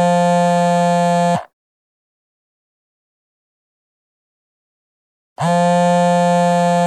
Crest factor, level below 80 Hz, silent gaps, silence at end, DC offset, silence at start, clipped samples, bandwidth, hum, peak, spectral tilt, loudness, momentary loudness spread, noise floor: 14 dB; -70 dBFS; 1.53-5.36 s; 0 s; under 0.1%; 0 s; under 0.1%; 12.5 kHz; none; -4 dBFS; -6 dB/octave; -15 LUFS; 5 LU; under -90 dBFS